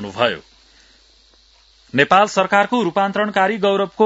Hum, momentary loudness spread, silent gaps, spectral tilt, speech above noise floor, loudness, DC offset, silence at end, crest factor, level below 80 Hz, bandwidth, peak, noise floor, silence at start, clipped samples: none; 7 LU; none; -4.5 dB/octave; 36 dB; -17 LUFS; under 0.1%; 0 s; 18 dB; -58 dBFS; 8 kHz; 0 dBFS; -53 dBFS; 0 s; under 0.1%